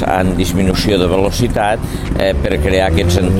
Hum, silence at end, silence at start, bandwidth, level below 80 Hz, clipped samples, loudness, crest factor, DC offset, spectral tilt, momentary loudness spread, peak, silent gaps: none; 0 s; 0 s; 16.5 kHz; -22 dBFS; under 0.1%; -14 LUFS; 12 dB; under 0.1%; -6 dB/octave; 4 LU; 0 dBFS; none